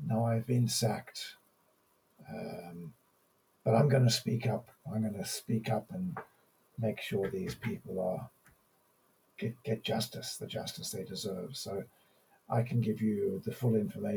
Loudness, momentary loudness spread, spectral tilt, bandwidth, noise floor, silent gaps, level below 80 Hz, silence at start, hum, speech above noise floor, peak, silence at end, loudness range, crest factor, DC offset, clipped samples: -34 LUFS; 14 LU; -5.5 dB/octave; over 20 kHz; -72 dBFS; none; -70 dBFS; 0 s; none; 38 dB; -14 dBFS; 0 s; 7 LU; 20 dB; under 0.1%; under 0.1%